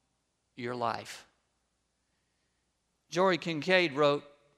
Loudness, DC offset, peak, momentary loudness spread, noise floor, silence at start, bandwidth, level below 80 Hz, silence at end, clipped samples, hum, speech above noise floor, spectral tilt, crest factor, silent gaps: -30 LUFS; under 0.1%; -10 dBFS; 15 LU; -79 dBFS; 0.6 s; 13 kHz; -80 dBFS; 0.35 s; under 0.1%; none; 49 dB; -5 dB/octave; 24 dB; none